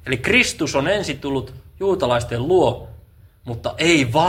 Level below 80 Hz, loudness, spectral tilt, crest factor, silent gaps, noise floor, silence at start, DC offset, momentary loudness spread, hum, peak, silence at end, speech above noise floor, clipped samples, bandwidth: -42 dBFS; -19 LUFS; -4.5 dB/octave; 18 dB; none; -47 dBFS; 0.05 s; under 0.1%; 15 LU; none; 0 dBFS; 0 s; 28 dB; under 0.1%; 16 kHz